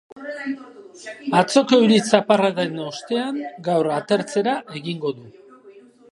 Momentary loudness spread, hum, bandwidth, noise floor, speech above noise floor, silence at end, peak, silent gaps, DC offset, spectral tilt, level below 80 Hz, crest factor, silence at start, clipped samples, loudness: 17 LU; none; 11.5 kHz; -47 dBFS; 27 dB; 0.35 s; 0 dBFS; none; under 0.1%; -5 dB/octave; -70 dBFS; 20 dB; 0.15 s; under 0.1%; -20 LUFS